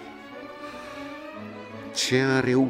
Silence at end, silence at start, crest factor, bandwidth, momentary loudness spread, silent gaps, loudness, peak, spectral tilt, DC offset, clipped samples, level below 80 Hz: 0 s; 0 s; 18 dB; 15.5 kHz; 18 LU; none; -26 LUFS; -10 dBFS; -4.5 dB/octave; under 0.1%; under 0.1%; -62 dBFS